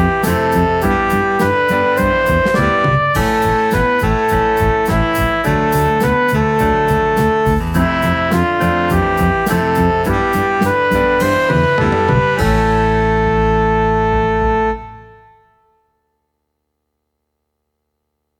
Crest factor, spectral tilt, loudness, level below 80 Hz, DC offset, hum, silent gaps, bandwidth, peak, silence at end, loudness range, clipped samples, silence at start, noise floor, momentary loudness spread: 14 dB; -6.5 dB/octave; -14 LUFS; -26 dBFS; under 0.1%; 60 Hz at -45 dBFS; none; 19 kHz; -2 dBFS; 3.35 s; 3 LU; under 0.1%; 0 s; -72 dBFS; 2 LU